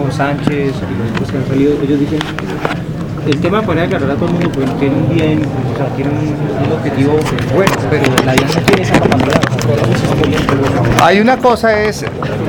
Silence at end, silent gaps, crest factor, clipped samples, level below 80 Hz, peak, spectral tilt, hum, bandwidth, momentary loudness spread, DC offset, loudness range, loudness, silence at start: 0 s; none; 12 dB; 0.2%; -34 dBFS; 0 dBFS; -6.5 dB/octave; none; over 20 kHz; 7 LU; under 0.1%; 4 LU; -13 LUFS; 0 s